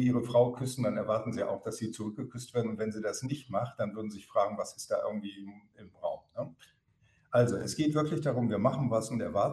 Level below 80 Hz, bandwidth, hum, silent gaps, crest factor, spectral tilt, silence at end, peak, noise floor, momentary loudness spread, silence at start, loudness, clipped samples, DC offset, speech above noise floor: -66 dBFS; 12.5 kHz; none; none; 18 dB; -6.5 dB/octave; 0 s; -14 dBFS; -69 dBFS; 12 LU; 0 s; -32 LUFS; under 0.1%; under 0.1%; 37 dB